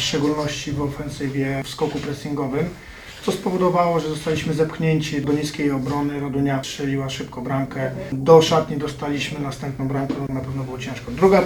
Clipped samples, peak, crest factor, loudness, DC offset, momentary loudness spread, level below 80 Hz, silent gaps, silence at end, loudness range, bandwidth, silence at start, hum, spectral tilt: under 0.1%; 0 dBFS; 22 dB; -22 LUFS; under 0.1%; 10 LU; -46 dBFS; none; 0 s; 4 LU; 19 kHz; 0 s; none; -6 dB/octave